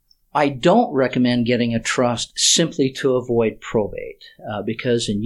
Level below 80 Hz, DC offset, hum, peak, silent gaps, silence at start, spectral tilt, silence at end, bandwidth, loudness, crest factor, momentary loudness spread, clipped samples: -48 dBFS; under 0.1%; none; -2 dBFS; none; 0.35 s; -4 dB/octave; 0 s; 12.5 kHz; -19 LUFS; 18 dB; 12 LU; under 0.1%